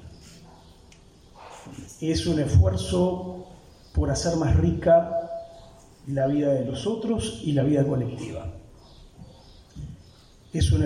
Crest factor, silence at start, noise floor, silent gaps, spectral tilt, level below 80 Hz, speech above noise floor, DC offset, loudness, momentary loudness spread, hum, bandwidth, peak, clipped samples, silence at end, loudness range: 18 dB; 0 s; -52 dBFS; none; -6.5 dB/octave; -36 dBFS; 29 dB; under 0.1%; -24 LUFS; 22 LU; none; 11.5 kHz; -8 dBFS; under 0.1%; 0 s; 5 LU